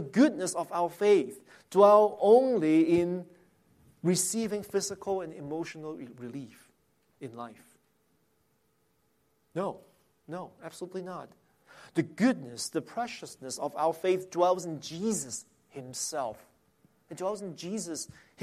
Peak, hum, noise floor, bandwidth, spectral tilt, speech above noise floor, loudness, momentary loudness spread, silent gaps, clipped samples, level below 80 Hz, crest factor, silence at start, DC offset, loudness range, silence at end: -10 dBFS; none; -72 dBFS; 15.5 kHz; -5 dB/octave; 44 dB; -29 LUFS; 21 LU; none; under 0.1%; -74 dBFS; 20 dB; 0 s; under 0.1%; 19 LU; 0 s